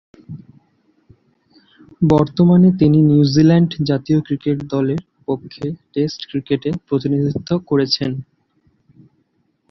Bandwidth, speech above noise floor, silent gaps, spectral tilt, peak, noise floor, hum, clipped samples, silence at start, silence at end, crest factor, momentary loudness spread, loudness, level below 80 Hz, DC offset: 6.2 kHz; 49 dB; none; -8 dB/octave; -2 dBFS; -64 dBFS; none; under 0.1%; 0.3 s; 1.5 s; 16 dB; 14 LU; -17 LUFS; -48 dBFS; under 0.1%